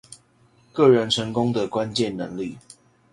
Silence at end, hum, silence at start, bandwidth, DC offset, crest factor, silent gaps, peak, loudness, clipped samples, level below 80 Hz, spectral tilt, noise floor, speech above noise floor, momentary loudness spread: 0.55 s; none; 0.1 s; 11.5 kHz; under 0.1%; 20 dB; none; -4 dBFS; -22 LUFS; under 0.1%; -58 dBFS; -5.5 dB/octave; -58 dBFS; 37 dB; 15 LU